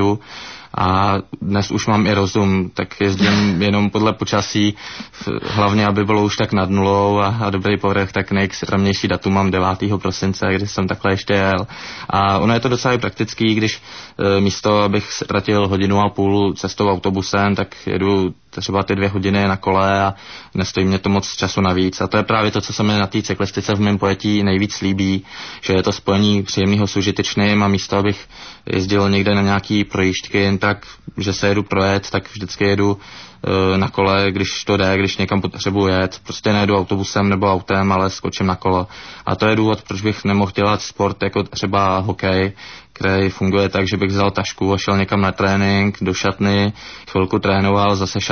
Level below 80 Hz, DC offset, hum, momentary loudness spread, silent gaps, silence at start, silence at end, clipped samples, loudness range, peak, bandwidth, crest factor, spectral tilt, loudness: -38 dBFS; 0.2%; none; 7 LU; none; 0 s; 0 s; under 0.1%; 1 LU; -4 dBFS; 6.6 kHz; 14 dB; -5.5 dB/octave; -17 LUFS